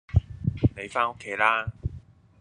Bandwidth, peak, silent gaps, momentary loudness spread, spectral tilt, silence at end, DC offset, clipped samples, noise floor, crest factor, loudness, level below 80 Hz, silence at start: 10 kHz; -6 dBFS; none; 12 LU; -7 dB/octave; 0.4 s; under 0.1%; under 0.1%; -47 dBFS; 22 dB; -27 LUFS; -40 dBFS; 0.1 s